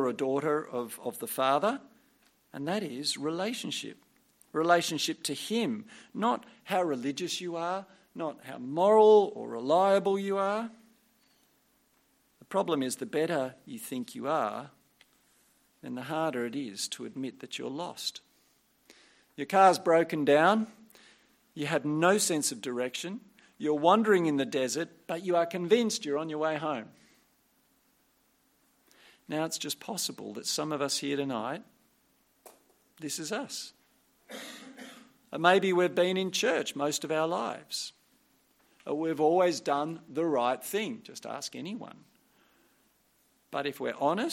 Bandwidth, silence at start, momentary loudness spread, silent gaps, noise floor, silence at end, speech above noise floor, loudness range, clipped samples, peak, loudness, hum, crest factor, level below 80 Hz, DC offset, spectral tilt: 16.5 kHz; 0 s; 17 LU; none; -70 dBFS; 0 s; 40 dB; 11 LU; under 0.1%; -6 dBFS; -30 LUFS; none; 24 dB; -82 dBFS; under 0.1%; -4 dB/octave